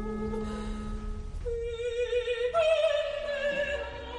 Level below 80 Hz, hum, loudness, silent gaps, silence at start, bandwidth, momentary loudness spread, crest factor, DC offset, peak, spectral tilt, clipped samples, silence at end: -42 dBFS; none; -31 LUFS; none; 0 s; 10.5 kHz; 13 LU; 14 dB; under 0.1%; -16 dBFS; -5 dB/octave; under 0.1%; 0 s